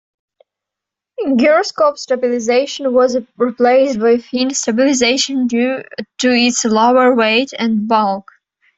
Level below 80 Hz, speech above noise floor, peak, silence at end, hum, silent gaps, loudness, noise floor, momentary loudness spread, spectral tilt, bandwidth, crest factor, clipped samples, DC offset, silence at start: -60 dBFS; 70 dB; -2 dBFS; 0.55 s; none; none; -14 LUFS; -84 dBFS; 7 LU; -3 dB/octave; 8 kHz; 12 dB; under 0.1%; under 0.1%; 1.2 s